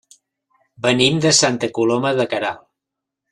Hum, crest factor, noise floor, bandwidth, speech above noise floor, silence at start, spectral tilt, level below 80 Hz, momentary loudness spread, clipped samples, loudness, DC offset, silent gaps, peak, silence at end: none; 20 dB; -83 dBFS; 12.5 kHz; 65 dB; 0.8 s; -3.5 dB/octave; -58 dBFS; 10 LU; under 0.1%; -17 LUFS; under 0.1%; none; 0 dBFS; 0.75 s